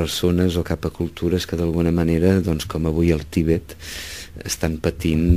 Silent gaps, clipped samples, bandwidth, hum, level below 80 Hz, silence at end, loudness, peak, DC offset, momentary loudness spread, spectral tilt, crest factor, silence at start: none; under 0.1%; 16 kHz; none; -32 dBFS; 0 s; -21 LUFS; -2 dBFS; 0.4%; 12 LU; -6 dB/octave; 18 dB; 0 s